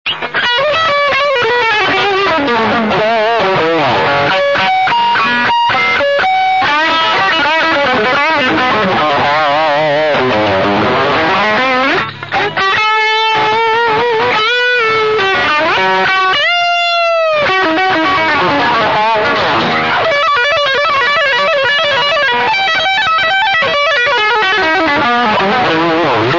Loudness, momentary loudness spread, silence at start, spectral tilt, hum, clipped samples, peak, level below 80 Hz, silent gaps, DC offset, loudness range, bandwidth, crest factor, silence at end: -10 LUFS; 2 LU; 0.05 s; -4 dB/octave; none; under 0.1%; -2 dBFS; -48 dBFS; none; 0.6%; 1 LU; 7.4 kHz; 10 dB; 0 s